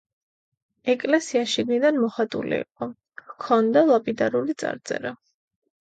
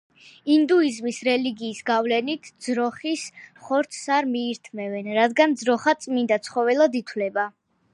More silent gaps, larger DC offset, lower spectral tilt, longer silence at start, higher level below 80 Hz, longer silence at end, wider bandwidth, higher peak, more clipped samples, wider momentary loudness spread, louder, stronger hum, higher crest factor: neither; neither; about the same, -4.5 dB/octave vs -4 dB/octave; first, 0.85 s vs 0.45 s; first, -68 dBFS vs -76 dBFS; first, 0.7 s vs 0.45 s; second, 9.2 kHz vs 11.5 kHz; about the same, -6 dBFS vs -6 dBFS; neither; first, 15 LU vs 11 LU; about the same, -23 LUFS vs -23 LUFS; neither; about the same, 18 dB vs 18 dB